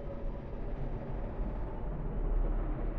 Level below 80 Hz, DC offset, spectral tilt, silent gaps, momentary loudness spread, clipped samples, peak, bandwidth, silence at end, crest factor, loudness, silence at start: -36 dBFS; under 0.1%; -10.5 dB/octave; none; 6 LU; under 0.1%; -22 dBFS; 3.3 kHz; 0 s; 12 dB; -40 LUFS; 0 s